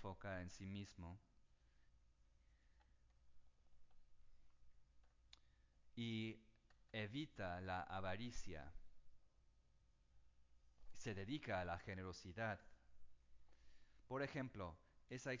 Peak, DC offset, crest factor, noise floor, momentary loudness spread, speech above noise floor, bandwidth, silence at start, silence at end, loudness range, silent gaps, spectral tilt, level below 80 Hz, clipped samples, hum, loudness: -32 dBFS; under 0.1%; 22 dB; -75 dBFS; 11 LU; 26 dB; 7.6 kHz; 0 s; 0 s; 8 LU; none; -5.5 dB/octave; -68 dBFS; under 0.1%; none; -51 LUFS